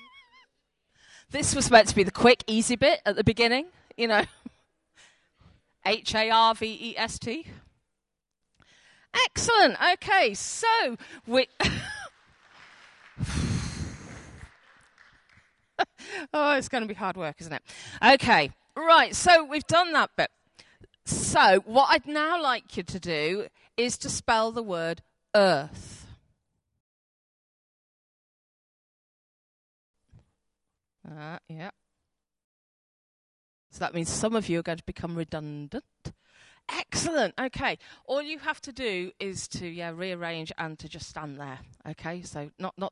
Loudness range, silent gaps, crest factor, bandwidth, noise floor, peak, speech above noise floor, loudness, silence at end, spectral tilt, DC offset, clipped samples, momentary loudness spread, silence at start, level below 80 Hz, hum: 13 LU; 26.80-29.94 s, 32.44-33.70 s; 24 dB; 11.5 kHz; -84 dBFS; -4 dBFS; 58 dB; -25 LUFS; 0 s; -3 dB/octave; under 0.1%; under 0.1%; 21 LU; 1.3 s; -52 dBFS; none